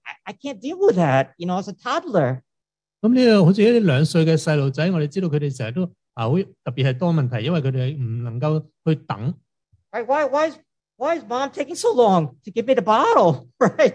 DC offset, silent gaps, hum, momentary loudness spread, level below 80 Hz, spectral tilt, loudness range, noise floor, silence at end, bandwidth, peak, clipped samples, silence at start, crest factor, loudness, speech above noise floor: under 0.1%; none; none; 12 LU; -64 dBFS; -7 dB/octave; 6 LU; -85 dBFS; 0 s; 11 kHz; -4 dBFS; under 0.1%; 0.05 s; 16 dB; -20 LUFS; 66 dB